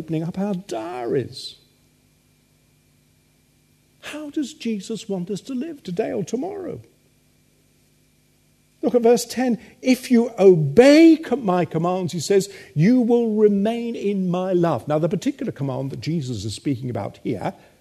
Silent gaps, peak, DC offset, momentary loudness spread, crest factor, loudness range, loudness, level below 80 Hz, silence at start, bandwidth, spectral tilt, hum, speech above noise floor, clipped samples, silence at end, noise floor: none; 0 dBFS; under 0.1%; 15 LU; 20 dB; 16 LU; -20 LUFS; -60 dBFS; 0 s; 13.5 kHz; -6.5 dB/octave; none; 40 dB; under 0.1%; 0.3 s; -60 dBFS